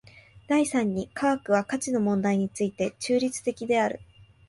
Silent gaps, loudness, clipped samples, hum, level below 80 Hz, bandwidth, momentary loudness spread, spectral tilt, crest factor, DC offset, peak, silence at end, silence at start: none; -26 LUFS; under 0.1%; none; -62 dBFS; 11.5 kHz; 5 LU; -5 dB/octave; 16 dB; under 0.1%; -10 dBFS; 0.45 s; 0.35 s